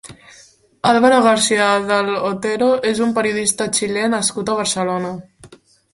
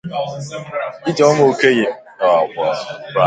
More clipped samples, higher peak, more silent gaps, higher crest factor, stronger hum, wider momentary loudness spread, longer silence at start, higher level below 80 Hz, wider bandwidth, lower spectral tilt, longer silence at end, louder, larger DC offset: neither; about the same, 0 dBFS vs 0 dBFS; neither; about the same, 16 dB vs 16 dB; neither; second, 8 LU vs 13 LU; about the same, 0.05 s vs 0.05 s; about the same, -56 dBFS vs -60 dBFS; first, 11.5 kHz vs 9.2 kHz; second, -3 dB/octave vs -5 dB/octave; first, 0.45 s vs 0 s; about the same, -16 LUFS vs -17 LUFS; neither